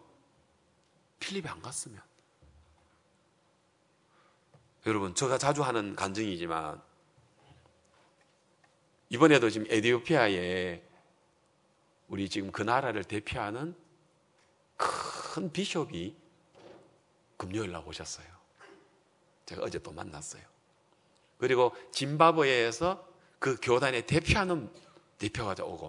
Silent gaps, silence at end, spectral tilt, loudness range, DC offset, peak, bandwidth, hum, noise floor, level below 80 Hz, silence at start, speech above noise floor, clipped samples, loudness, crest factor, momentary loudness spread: none; 0 s; -4.5 dB/octave; 15 LU; under 0.1%; -6 dBFS; 11 kHz; none; -70 dBFS; -60 dBFS; 1.2 s; 39 dB; under 0.1%; -30 LUFS; 26 dB; 17 LU